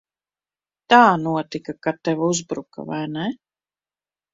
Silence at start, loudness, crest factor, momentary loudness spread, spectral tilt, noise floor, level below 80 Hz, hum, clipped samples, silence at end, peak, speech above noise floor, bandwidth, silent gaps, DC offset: 0.9 s; -20 LUFS; 22 dB; 17 LU; -4.5 dB/octave; under -90 dBFS; -64 dBFS; 50 Hz at -55 dBFS; under 0.1%; 1 s; 0 dBFS; over 70 dB; 7.8 kHz; none; under 0.1%